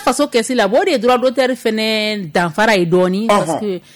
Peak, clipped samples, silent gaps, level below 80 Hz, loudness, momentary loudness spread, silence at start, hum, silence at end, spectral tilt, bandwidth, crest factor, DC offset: -4 dBFS; under 0.1%; none; -52 dBFS; -15 LUFS; 4 LU; 0 s; none; 0.15 s; -4.5 dB/octave; 19 kHz; 12 dB; under 0.1%